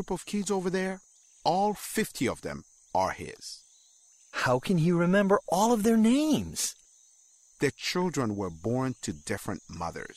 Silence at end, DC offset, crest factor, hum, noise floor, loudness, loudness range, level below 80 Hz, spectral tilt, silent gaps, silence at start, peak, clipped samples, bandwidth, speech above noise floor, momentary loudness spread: 0.05 s; under 0.1%; 16 dB; none; -60 dBFS; -28 LUFS; 6 LU; -58 dBFS; -5 dB/octave; none; 0 s; -12 dBFS; under 0.1%; 16 kHz; 33 dB; 15 LU